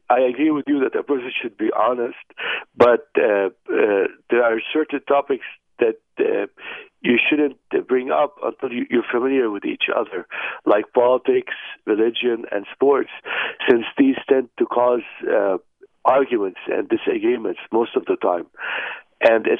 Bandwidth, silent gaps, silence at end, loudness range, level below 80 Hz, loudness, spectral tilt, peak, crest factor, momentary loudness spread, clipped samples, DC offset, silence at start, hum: 4.9 kHz; none; 0 s; 2 LU; -68 dBFS; -20 LUFS; -7 dB/octave; 0 dBFS; 20 dB; 9 LU; under 0.1%; under 0.1%; 0.1 s; none